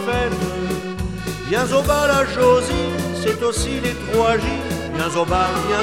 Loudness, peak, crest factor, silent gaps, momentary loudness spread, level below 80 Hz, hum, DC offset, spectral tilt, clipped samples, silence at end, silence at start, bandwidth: -19 LUFS; -4 dBFS; 14 dB; none; 9 LU; -34 dBFS; none; 0.4%; -4.5 dB/octave; under 0.1%; 0 s; 0 s; 16.5 kHz